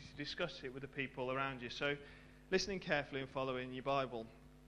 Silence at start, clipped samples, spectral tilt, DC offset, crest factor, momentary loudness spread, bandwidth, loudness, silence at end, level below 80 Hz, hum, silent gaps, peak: 0 s; under 0.1%; -4.5 dB/octave; under 0.1%; 22 dB; 10 LU; 11.5 kHz; -41 LUFS; 0 s; -64 dBFS; none; none; -20 dBFS